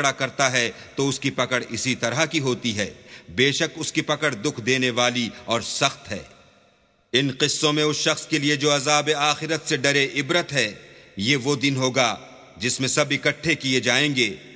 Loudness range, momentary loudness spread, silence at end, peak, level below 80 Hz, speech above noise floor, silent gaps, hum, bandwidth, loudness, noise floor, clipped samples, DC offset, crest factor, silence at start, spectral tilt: 3 LU; 7 LU; 0 s; -2 dBFS; -58 dBFS; 38 dB; none; none; 8 kHz; -22 LUFS; -60 dBFS; under 0.1%; under 0.1%; 22 dB; 0 s; -3 dB/octave